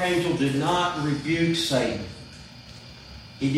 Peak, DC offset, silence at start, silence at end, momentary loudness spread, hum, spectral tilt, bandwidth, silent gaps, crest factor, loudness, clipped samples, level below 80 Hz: -10 dBFS; under 0.1%; 0 s; 0 s; 20 LU; none; -5 dB/octave; 15.5 kHz; none; 16 dB; -24 LUFS; under 0.1%; -52 dBFS